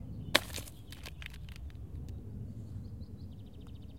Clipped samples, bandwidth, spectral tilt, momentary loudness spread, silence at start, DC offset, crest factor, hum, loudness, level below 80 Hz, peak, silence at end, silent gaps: under 0.1%; 16.5 kHz; -3.5 dB/octave; 18 LU; 0 s; 0.2%; 40 dB; none; -40 LUFS; -50 dBFS; -2 dBFS; 0 s; none